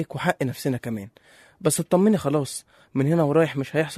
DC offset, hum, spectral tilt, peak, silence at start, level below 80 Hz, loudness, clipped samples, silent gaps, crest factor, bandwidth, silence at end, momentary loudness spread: under 0.1%; none; -6 dB/octave; -6 dBFS; 0 s; -62 dBFS; -23 LUFS; under 0.1%; none; 18 dB; 13.5 kHz; 0 s; 13 LU